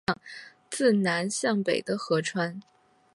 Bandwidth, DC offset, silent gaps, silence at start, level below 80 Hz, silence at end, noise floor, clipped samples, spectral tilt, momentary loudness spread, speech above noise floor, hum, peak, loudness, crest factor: 11.5 kHz; under 0.1%; none; 0.1 s; -68 dBFS; 0.55 s; -47 dBFS; under 0.1%; -4.5 dB/octave; 17 LU; 21 dB; none; -10 dBFS; -27 LUFS; 18 dB